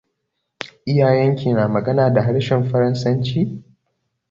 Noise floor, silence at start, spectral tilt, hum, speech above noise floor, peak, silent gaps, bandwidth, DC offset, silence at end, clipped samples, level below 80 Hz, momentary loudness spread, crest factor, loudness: -75 dBFS; 0.6 s; -8 dB/octave; none; 58 dB; -4 dBFS; none; 7.4 kHz; under 0.1%; 0.7 s; under 0.1%; -52 dBFS; 13 LU; 16 dB; -18 LUFS